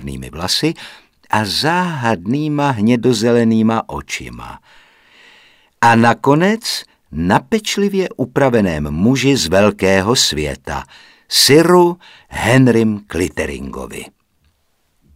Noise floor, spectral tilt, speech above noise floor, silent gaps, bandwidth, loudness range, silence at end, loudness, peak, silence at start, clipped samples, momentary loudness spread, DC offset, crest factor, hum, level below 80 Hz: -62 dBFS; -4.5 dB/octave; 47 dB; none; 16 kHz; 4 LU; 1.05 s; -14 LUFS; 0 dBFS; 0 s; under 0.1%; 16 LU; under 0.1%; 16 dB; none; -40 dBFS